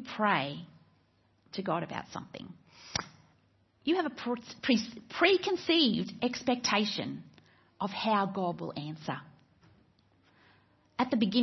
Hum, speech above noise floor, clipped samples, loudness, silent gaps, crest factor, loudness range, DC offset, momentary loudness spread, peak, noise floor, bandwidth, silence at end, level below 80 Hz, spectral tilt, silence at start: none; 38 dB; under 0.1%; -31 LUFS; none; 22 dB; 8 LU; under 0.1%; 17 LU; -10 dBFS; -69 dBFS; 6.2 kHz; 0 s; -70 dBFS; -4.5 dB/octave; 0 s